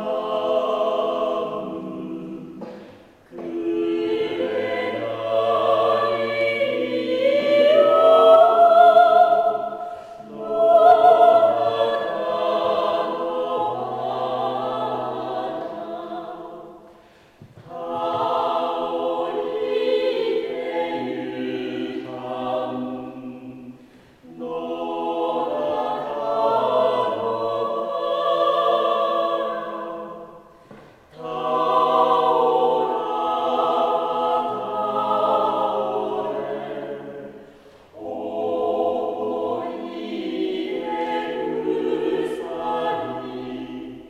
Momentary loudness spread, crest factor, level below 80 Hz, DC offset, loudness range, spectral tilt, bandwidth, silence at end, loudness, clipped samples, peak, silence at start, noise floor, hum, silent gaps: 18 LU; 18 dB; -64 dBFS; under 0.1%; 13 LU; -6 dB/octave; 8.4 kHz; 0 s; -21 LUFS; under 0.1%; -2 dBFS; 0 s; -51 dBFS; none; none